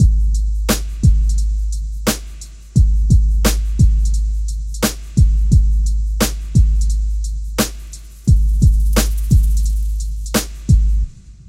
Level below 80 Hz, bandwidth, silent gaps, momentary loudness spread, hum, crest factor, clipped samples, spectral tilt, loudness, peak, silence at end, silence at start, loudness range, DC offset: -16 dBFS; 16 kHz; none; 9 LU; none; 14 dB; under 0.1%; -5.5 dB/octave; -17 LUFS; -2 dBFS; 0 s; 0 s; 1 LU; under 0.1%